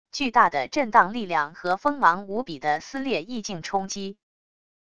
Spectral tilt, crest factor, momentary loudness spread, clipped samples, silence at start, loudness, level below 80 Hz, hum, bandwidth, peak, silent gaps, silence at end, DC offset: -3.5 dB/octave; 22 dB; 12 LU; under 0.1%; 0.05 s; -24 LUFS; -60 dBFS; none; 11 kHz; -2 dBFS; none; 0.65 s; 0.5%